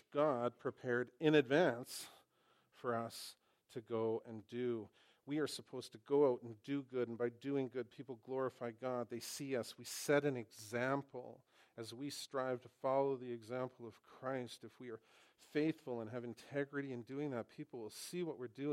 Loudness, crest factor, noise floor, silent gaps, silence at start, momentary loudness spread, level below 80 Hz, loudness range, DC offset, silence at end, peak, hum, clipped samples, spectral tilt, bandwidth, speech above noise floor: -41 LUFS; 22 dB; -76 dBFS; none; 0.1 s; 17 LU; -90 dBFS; 6 LU; under 0.1%; 0 s; -20 dBFS; none; under 0.1%; -5 dB/octave; 16 kHz; 35 dB